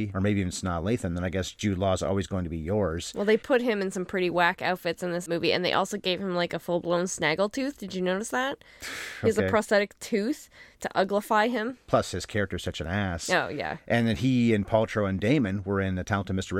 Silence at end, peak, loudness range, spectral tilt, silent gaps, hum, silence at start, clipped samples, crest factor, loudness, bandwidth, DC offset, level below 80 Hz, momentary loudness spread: 0 s; -8 dBFS; 2 LU; -5 dB/octave; none; none; 0 s; under 0.1%; 20 dB; -27 LUFS; 16.5 kHz; under 0.1%; -54 dBFS; 8 LU